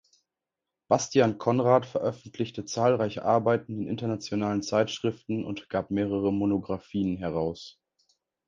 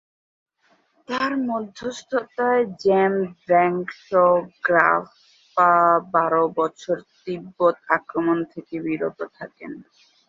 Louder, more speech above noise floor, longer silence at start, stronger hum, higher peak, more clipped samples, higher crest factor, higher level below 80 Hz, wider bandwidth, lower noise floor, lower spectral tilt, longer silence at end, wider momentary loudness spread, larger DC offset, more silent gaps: second, -28 LUFS vs -21 LUFS; first, 61 dB vs 42 dB; second, 0.9 s vs 1.1 s; neither; second, -8 dBFS vs 0 dBFS; neither; about the same, 20 dB vs 22 dB; first, -58 dBFS vs -66 dBFS; about the same, 7.8 kHz vs 7.6 kHz; first, -88 dBFS vs -63 dBFS; about the same, -6 dB/octave vs -6.5 dB/octave; first, 0.75 s vs 0.45 s; second, 9 LU vs 15 LU; neither; neither